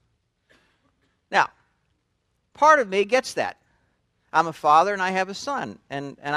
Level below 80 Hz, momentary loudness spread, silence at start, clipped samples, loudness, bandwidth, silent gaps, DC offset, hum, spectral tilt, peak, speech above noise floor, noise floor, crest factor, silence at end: -68 dBFS; 14 LU; 1.3 s; under 0.1%; -22 LUFS; 13 kHz; none; under 0.1%; none; -3.5 dB/octave; -2 dBFS; 51 dB; -72 dBFS; 22 dB; 0 s